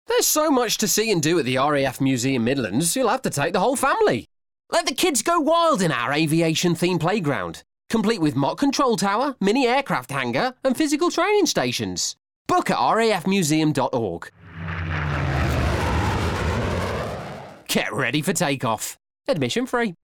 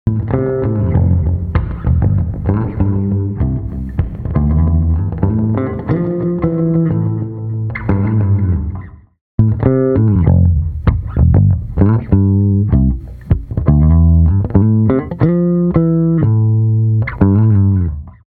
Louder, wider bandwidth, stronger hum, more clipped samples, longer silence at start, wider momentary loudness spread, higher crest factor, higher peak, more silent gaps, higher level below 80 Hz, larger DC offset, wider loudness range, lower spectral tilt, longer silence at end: second, -21 LUFS vs -14 LUFS; first, 19 kHz vs 3 kHz; neither; neither; about the same, 0.1 s vs 0.05 s; about the same, 8 LU vs 8 LU; about the same, 14 dB vs 12 dB; second, -6 dBFS vs 0 dBFS; second, 12.36-12.45 s vs 9.21-9.38 s; second, -42 dBFS vs -24 dBFS; neither; about the same, 4 LU vs 4 LU; second, -4 dB/octave vs -13.5 dB/octave; about the same, 0.1 s vs 0.2 s